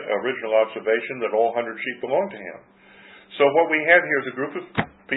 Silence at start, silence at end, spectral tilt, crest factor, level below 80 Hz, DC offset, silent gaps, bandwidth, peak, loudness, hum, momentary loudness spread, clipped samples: 0 s; 0 s; -9.5 dB/octave; 20 dB; -62 dBFS; under 0.1%; none; 4.1 kHz; -2 dBFS; -22 LUFS; none; 13 LU; under 0.1%